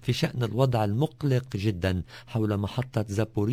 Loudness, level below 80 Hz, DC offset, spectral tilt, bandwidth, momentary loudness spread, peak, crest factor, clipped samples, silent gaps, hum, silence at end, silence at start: -28 LUFS; -46 dBFS; under 0.1%; -7 dB/octave; 16 kHz; 5 LU; -8 dBFS; 18 dB; under 0.1%; none; none; 0 s; 0 s